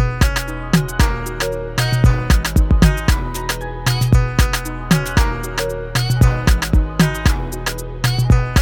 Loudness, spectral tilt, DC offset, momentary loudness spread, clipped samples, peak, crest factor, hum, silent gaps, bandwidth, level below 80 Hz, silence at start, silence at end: -18 LUFS; -5 dB/octave; under 0.1%; 8 LU; under 0.1%; 0 dBFS; 16 dB; none; none; 19.5 kHz; -20 dBFS; 0 s; 0 s